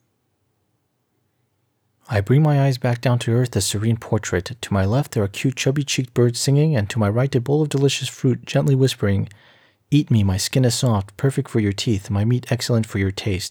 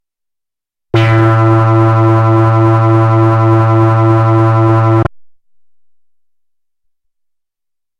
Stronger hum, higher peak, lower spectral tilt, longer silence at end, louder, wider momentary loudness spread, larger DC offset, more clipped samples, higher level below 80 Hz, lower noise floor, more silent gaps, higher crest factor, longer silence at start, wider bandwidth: neither; second, -6 dBFS vs 0 dBFS; second, -5.5 dB/octave vs -9.5 dB/octave; second, 0 s vs 2.75 s; second, -20 LUFS vs -9 LUFS; first, 5 LU vs 2 LU; neither; neither; second, -54 dBFS vs -42 dBFS; second, -69 dBFS vs -81 dBFS; neither; about the same, 14 dB vs 10 dB; first, 2.1 s vs 0.95 s; first, 17.5 kHz vs 5.6 kHz